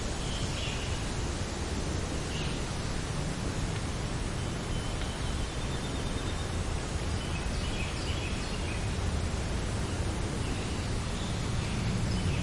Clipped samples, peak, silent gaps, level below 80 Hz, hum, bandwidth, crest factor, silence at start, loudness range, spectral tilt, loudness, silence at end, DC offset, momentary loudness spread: under 0.1%; -18 dBFS; none; -38 dBFS; none; 11.5 kHz; 14 dB; 0 s; 1 LU; -4.5 dB/octave; -34 LUFS; 0 s; under 0.1%; 2 LU